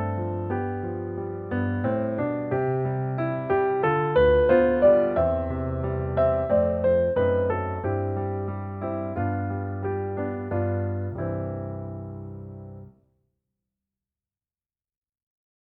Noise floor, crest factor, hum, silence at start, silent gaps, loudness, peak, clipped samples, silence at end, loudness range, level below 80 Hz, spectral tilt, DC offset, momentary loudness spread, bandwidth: under -90 dBFS; 18 dB; none; 0 s; none; -25 LUFS; -8 dBFS; under 0.1%; 2.9 s; 13 LU; -44 dBFS; -11 dB/octave; under 0.1%; 13 LU; 4.3 kHz